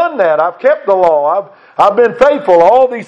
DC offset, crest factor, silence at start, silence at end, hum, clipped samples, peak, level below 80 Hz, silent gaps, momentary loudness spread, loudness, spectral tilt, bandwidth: under 0.1%; 10 dB; 0 s; 0.05 s; none; 0.7%; 0 dBFS; -48 dBFS; none; 6 LU; -10 LUFS; -6 dB/octave; 8 kHz